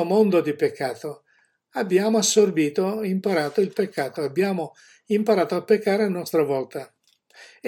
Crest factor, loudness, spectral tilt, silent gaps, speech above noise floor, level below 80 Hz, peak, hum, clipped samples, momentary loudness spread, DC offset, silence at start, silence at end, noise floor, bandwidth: 18 dB; -22 LUFS; -4.5 dB/octave; none; 43 dB; -78 dBFS; -6 dBFS; none; under 0.1%; 11 LU; under 0.1%; 0 s; 0 s; -65 dBFS; 17.5 kHz